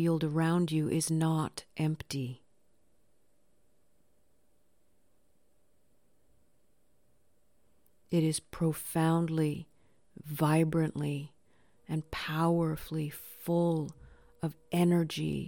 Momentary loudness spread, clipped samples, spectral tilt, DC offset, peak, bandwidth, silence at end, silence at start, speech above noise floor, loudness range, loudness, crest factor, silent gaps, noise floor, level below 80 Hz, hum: 12 LU; under 0.1%; -6.5 dB/octave; under 0.1%; -14 dBFS; 17.5 kHz; 0 s; 0 s; 44 dB; 8 LU; -32 LUFS; 18 dB; none; -74 dBFS; -62 dBFS; none